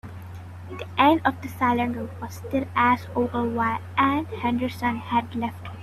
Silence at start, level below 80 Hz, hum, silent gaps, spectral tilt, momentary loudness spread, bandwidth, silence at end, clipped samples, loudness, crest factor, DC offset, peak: 0.05 s; -56 dBFS; none; none; -6.5 dB/octave; 16 LU; 14 kHz; 0 s; under 0.1%; -24 LUFS; 20 dB; under 0.1%; -4 dBFS